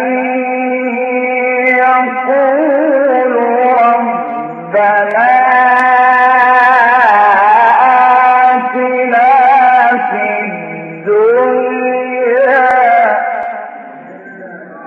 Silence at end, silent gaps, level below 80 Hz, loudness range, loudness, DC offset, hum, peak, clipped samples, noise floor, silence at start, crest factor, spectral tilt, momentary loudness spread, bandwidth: 0 s; none; -68 dBFS; 4 LU; -9 LUFS; under 0.1%; none; 0 dBFS; under 0.1%; -30 dBFS; 0 s; 10 dB; -6 dB/octave; 12 LU; 5.8 kHz